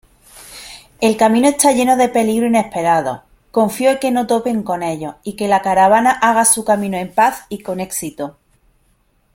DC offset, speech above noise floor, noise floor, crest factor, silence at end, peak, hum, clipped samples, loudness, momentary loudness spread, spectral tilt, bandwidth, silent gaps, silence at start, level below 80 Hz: under 0.1%; 44 dB; -59 dBFS; 16 dB; 1.05 s; 0 dBFS; none; under 0.1%; -15 LUFS; 15 LU; -3.5 dB/octave; 16.5 kHz; none; 0.35 s; -52 dBFS